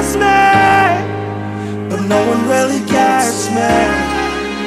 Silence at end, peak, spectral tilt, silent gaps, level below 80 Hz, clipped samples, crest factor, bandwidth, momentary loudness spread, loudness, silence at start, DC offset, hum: 0 s; 0 dBFS; -4.5 dB/octave; none; -36 dBFS; under 0.1%; 12 dB; 15 kHz; 12 LU; -13 LUFS; 0 s; 0.2%; none